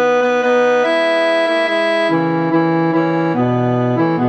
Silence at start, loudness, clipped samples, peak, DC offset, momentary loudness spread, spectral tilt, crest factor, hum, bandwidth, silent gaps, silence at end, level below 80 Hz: 0 s; -15 LUFS; under 0.1%; -4 dBFS; under 0.1%; 2 LU; -6.5 dB/octave; 10 dB; none; 8.4 kHz; none; 0 s; -60 dBFS